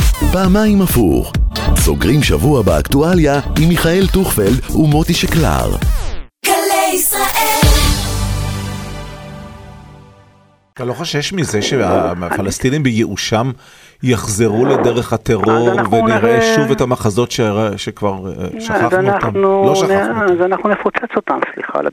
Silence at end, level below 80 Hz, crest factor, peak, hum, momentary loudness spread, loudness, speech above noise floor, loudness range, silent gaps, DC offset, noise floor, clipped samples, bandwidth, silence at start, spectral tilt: 0 s; -22 dBFS; 14 dB; 0 dBFS; none; 10 LU; -14 LUFS; 36 dB; 6 LU; none; under 0.1%; -49 dBFS; under 0.1%; over 20 kHz; 0 s; -5 dB/octave